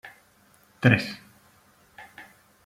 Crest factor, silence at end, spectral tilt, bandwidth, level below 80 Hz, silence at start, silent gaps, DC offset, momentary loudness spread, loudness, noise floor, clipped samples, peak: 26 dB; 0.45 s; -7 dB/octave; 15 kHz; -64 dBFS; 0.05 s; none; under 0.1%; 27 LU; -23 LUFS; -60 dBFS; under 0.1%; -4 dBFS